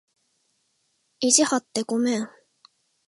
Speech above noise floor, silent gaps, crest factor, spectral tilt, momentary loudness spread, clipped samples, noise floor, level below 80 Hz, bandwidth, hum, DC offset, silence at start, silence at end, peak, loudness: 49 dB; none; 26 dB; -2 dB/octave; 10 LU; under 0.1%; -71 dBFS; -78 dBFS; 11.5 kHz; none; under 0.1%; 1.2 s; 0.8 s; 0 dBFS; -22 LUFS